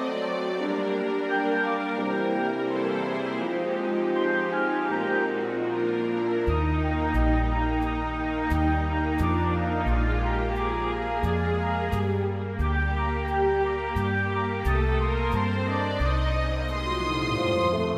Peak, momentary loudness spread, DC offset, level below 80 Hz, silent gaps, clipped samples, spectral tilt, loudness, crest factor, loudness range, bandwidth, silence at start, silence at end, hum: -12 dBFS; 4 LU; under 0.1%; -32 dBFS; none; under 0.1%; -7.5 dB/octave; -26 LUFS; 14 dB; 1 LU; 10 kHz; 0 s; 0 s; none